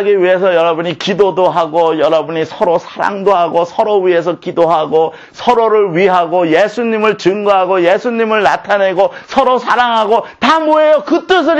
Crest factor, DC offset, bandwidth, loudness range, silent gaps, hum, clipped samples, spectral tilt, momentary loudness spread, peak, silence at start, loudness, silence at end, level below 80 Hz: 10 dB; under 0.1%; 8.6 kHz; 2 LU; none; none; under 0.1%; -5.5 dB/octave; 4 LU; 0 dBFS; 0 s; -12 LUFS; 0 s; -52 dBFS